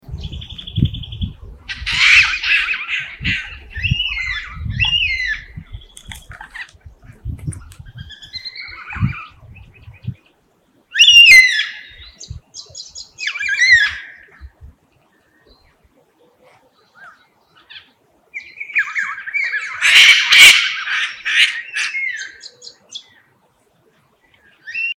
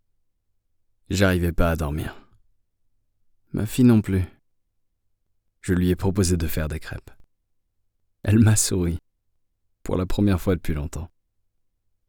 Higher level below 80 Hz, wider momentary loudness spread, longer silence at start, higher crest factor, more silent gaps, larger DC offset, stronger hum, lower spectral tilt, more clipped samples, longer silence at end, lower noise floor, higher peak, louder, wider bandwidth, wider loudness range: about the same, -38 dBFS vs -38 dBFS; first, 27 LU vs 17 LU; second, 0.1 s vs 1.1 s; about the same, 18 dB vs 20 dB; neither; neither; neither; second, -0.5 dB/octave vs -6 dB/octave; first, 0.3% vs under 0.1%; second, 0.05 s vs 1 s; second, -58 dBFS vs -70 dBFS; first, 0 dBFS vs -6 dBFS; first, -11 LUFS vs -22 LUFS; about the same, 19.5 kHz vs over 20 kHz; first, 19 LU vs 4 LU